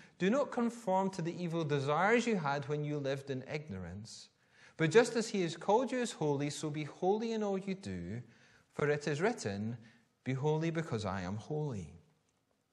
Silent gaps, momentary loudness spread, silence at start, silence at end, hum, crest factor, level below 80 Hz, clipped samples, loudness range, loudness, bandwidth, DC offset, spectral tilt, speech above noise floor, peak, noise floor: none; 15 LU; 0 s; 0.75 s; none; 22 dB; -72 dBFS; under 0.1%; 4 LU; -35 LUFS; 12 kHz; under 0.1%; -6 dB/octave; 43 dB; -12 dBFS; -77 dBFS